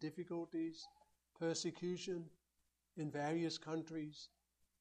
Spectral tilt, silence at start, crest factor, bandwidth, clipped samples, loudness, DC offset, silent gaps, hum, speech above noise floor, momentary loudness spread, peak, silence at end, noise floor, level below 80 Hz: -5 dB/octave; 0 s; 16 dB; 10 kHz; under 0.1%; -44 LUFS; under 0.1%; none; none; 40 dB; 16 LU; -30 dBFS; 0.55 s; -84 dBFS; -82 dBFS